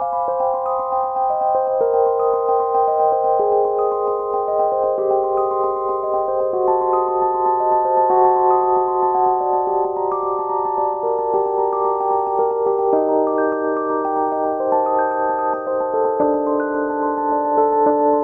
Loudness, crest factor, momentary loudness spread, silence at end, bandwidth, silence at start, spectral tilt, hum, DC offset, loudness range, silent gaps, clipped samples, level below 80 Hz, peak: -18 LUFS; 14 dB; 5 LU; 0 s; 2.6 kHz; 0 s; -10.5 dB/octave; none; under 0.1%; 2 LU; none; under 0.1%; -56 dBFS; -4 dBFS